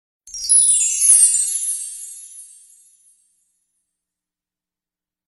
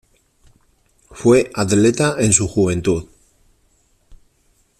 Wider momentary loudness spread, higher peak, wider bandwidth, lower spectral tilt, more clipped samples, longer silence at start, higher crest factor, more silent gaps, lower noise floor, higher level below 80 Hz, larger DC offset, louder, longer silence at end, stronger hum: first, 23 LU vs 6 LU; about the same, 0 dBFS vs 0 dBFS; first, 15 kHz vs 13.5 kHz; second, 5 dB/octave vs -5 dB/octave; neither; second, 0.25 s vs 1.15 s; about the same, 20 dB vs 20 dB; neither; first, -90 dBFS vs -60 dBFS; second, -64 dBFS vs -46 dBFS; neither; first, -12 LUFS vs -16 LUFS; first, 2.9 s vs 0.65 s; neither